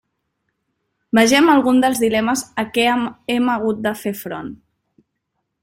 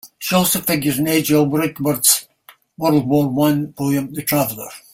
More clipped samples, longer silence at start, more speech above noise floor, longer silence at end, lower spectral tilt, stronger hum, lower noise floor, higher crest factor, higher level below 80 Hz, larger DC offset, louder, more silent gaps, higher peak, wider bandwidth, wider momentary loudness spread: neither; first, 1.15 s vs 0.05 s; first, 58 dB vs 33 dB; first, 1.05 s vs 0.15 s; about the same, -3.5 dB/octave vs -4 dB/octave; neither; first, -75 dBFS vs -50 dBFS; about the same, 18 dB vs 18 dB; about the same, -58 dBFS vs -54 dBFS; neither; about the same, -17 LUFS vs -17 LUFS; neither; about the same, 0 dBFS vs 0 dBFS; about the same, 16.5 kHz vs 16.5 kHz; first, 14 LU vs 6 LU